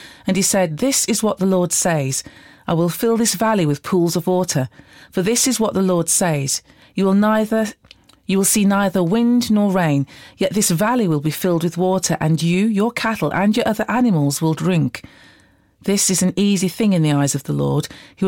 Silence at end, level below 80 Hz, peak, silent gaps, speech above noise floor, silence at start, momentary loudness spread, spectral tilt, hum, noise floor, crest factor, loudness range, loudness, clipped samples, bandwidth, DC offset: 0 s; -52 dBFS; -6 dBFS; none; 36 dB; 0 s; 7 LU; -4.5 dB/octave; none; -53 dBFS; 12 dB; 2 LU; -18 LUFS; under 0.1%; 17 kHz; under 0.1%